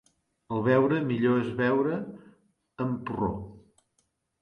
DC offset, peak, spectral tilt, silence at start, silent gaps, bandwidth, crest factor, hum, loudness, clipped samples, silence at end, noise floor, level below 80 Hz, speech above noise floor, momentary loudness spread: under 0.1%; -10 dBFS; -9 dB/octave; 0.5 s; none; 6.6 kHz; 20 dB; none; -27 LUFS; under 0.1%; 0.8 s; -75 dBFS; -58 dBFS; 48 dB; 13 LU